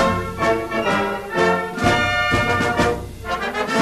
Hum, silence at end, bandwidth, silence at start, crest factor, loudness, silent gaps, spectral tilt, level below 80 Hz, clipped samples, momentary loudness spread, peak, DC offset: none; 0 s; 13.5 kHz; 0 s; 16 dB; -20 LUFS; none; -5 dB/octave; -38 dBFS; under 0.1%; 6 LU; -4 dBFS; under 0.1%